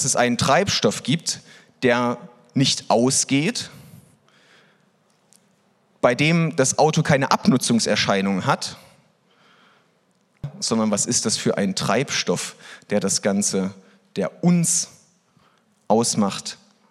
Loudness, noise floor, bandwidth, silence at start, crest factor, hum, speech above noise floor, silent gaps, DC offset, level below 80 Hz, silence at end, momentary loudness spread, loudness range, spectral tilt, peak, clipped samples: -20 LUFS; -63 dBFS; 14 kHz; 0 s; 22 dB; none; 43 dB; none; under 0.1%; -62 dBFS; 0.35 s; 13 LU; 5 LU; -4 dB/octave; 0 dBFS; under 0.1%